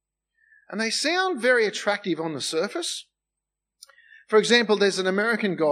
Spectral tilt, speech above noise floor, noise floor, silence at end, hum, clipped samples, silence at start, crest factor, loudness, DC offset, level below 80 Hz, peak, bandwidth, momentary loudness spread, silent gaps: -3 dB/octave; 63 dB; -86 dBFS; 0 s; 50 Hz at -75 dBFS; under 0.1%; 0.7 s; 20 dB; -23 LUFS; under 0.1%; -86 dBFS; -4 dBFS; 15 kHz; 10 LU; none